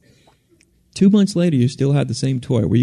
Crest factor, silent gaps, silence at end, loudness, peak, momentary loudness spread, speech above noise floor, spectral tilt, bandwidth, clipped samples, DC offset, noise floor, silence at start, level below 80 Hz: 14 dB; none; 0 s; -17 LUFS; -4 dBFS; 7 LU; 41 dB; -7 dB/octave; 11.5 kHz; under 0.1%; under 0.1%; -57 dBFS; 0.95 s; -50 dBFS